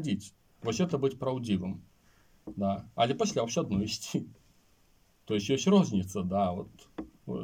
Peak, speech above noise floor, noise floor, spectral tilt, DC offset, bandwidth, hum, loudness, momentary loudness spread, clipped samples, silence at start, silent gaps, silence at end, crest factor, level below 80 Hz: -12 dBFS; 36 dB; -66 dBFS; -5.5 dB/octave; under 0.1%; 16 kHz; none; -31 LUFS; 20 LU; under 0.1%; 0 s; none; 0 s; 20 dB; -62 dBFS